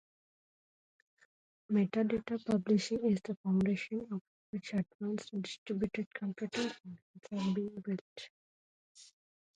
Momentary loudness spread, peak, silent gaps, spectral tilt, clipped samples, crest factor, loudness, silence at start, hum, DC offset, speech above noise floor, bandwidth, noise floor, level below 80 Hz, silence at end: 13 LU; -20 dBFS; 3.37-3.44 s, 4.21-4.53 s, 4.95-4.99 s, 5.58-5.66 s, 6.06-6.11 s, 7.02-7.14 s, 8.01-8.16 s, 8.30-8.95 s; -6.5 dB/octave; under 0.1%; 18 dB; -36 LUFS; 1.7 s; none; under 0.1%; over 55 dB; 9.4 kHz; under -90 dBFS; -70 dBFS; 0.5 s